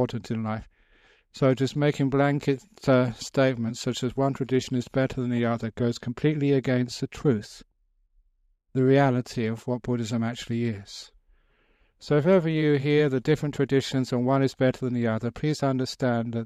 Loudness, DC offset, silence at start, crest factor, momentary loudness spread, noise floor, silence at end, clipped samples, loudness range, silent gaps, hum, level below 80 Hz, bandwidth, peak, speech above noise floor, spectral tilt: -25 LUFS; under 0.1%; 0 s; 18 dB; 8 LU; -68 dBFS; 0 s; under 0.1%; 3 LU; none; none; -56 dBFS; 13 kHz; -8 dBFS; 43 dB; -7 dB/octave